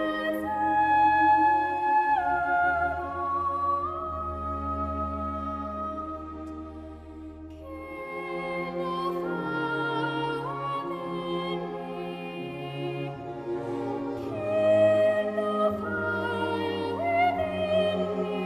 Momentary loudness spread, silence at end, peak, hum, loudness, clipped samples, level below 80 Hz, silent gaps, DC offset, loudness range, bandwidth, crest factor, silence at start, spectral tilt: 15 LU; 0 s; -12 dBFS; none; -28 LUFS; under 0.1%; -48 dBFS; none; under 0.1%; 11 LU; 13.5 kHz; 16 dB; 0 s; -7 dB/octave